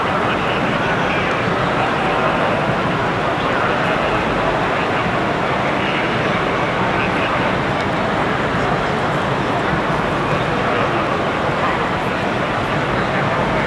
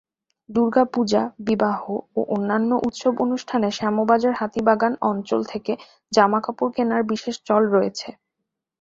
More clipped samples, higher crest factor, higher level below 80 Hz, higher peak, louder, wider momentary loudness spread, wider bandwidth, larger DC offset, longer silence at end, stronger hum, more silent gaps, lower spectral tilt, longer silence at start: neither; about the same, 14 dB vs 18 dB; first, -38 dBFS vs -62 dBFS; about the same, -2 dBFS vs -2 dBFS; first, -18 LUFS vs -22 LUFS; second, 1 LU vs 9 LU; first, 12 kHz vs 7.8 kHz; neither; second, 0 s vs 0.7 s; neither; neither; about the same, -6 dB/octave vs -5.5 dB/octave; second, 0 s vs 0.5 s